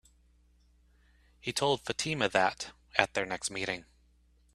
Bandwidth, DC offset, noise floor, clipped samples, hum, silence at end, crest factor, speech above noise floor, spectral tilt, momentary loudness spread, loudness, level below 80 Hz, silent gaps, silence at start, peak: 13.5 kHz; under 0.1%; -65 dBFS; under 0.1%; none; 0.7 s; 32 dB; 34 dB; -3 dB/octave; 10 LU; -31 LUFS; -62 dBFS; none; 1.45 s; -4 dBFS